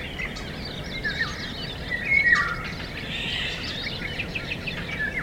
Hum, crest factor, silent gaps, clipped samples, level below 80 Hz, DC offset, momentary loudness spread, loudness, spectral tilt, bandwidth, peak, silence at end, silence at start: none; 20 dB; none; under 0.1%; -42 dBFS; under 0.1%; 13 LU; -26 LUFS; -4 dB/octave; 16 kHz; -8 dBFS; 0 s; 0 s